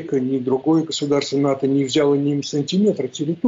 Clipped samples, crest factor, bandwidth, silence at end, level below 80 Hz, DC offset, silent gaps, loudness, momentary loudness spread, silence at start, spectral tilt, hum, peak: under 0.1%; 10 dB; 7.8 kHz; 0 s; -66 dBFS; under 0.1%; none; -20 LUFS; 4 LU; 0 s; -6 dB/octave; none; -8 dBFS